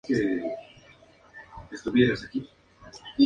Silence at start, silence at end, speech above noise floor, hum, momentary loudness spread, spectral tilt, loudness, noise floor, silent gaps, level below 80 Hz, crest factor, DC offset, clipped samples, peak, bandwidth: 0.05 s; 0 s; 30 dB; none; 25 LU; -6.5 dB/octave; -27 LUFS; -55 dBFS; none; -56 dBFS; 20 dB; under 0.1%; under 0.1%; -8 dBFS; 9 kHz